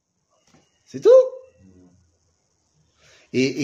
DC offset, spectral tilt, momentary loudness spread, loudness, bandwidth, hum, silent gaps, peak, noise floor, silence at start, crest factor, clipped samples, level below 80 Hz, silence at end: under 0.1%; -5.5 dB/octave; 15 LU; -17 LUFS; 7.6 kHz; none; none; -4 dBFS; -67 dBFS; 0.95 s; 18 dB; under 0.1%; -72 dBFS; 0 s